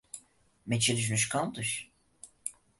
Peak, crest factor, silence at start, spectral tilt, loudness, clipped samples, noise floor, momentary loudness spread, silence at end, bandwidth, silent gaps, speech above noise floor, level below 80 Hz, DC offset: -14 dBFS; 20 dB; 0.15 s; -3 dB/octave; -31 LUFS; under 0.1%; -62 dBFS; 20 LU; 0.3 s; 12 kHz; none; 32 dB; -66 dBFS; under 0.1%